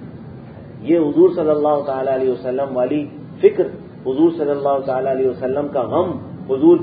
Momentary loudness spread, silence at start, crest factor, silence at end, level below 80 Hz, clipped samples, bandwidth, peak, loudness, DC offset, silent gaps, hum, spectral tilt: 16 LU; 0 s; 18 dB; 0 s; -54 dBFS; under 0.1%; 4.8 kHz; 0 dBFS; -18 LUFS; under 0.1%; none; none; -12.5 dB/octave